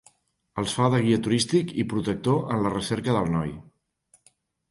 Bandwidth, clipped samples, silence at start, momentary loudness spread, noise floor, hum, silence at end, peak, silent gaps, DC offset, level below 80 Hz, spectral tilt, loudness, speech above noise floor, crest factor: 11.5 kHz; under 0.1%; 0.55 s; 8 LU; -64 dBFS; none; 1.1 s; -8 dBFS; none; under 0.1%; -52 dBFS; -6 dB/octave; -25 LUFS; 40 dB; 18 dB